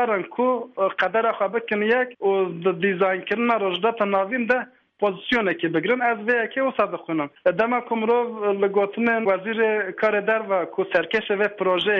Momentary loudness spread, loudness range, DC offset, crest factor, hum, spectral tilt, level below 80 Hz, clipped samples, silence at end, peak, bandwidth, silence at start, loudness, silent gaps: 3 LU; 1 LU; under 0.1%; 14 dB; none; -7 dB/octave; -64 dBFS; under 0.1%; 0 s; -8 dBFS; 6.4 kHz; 0 s; -22 LUFS; none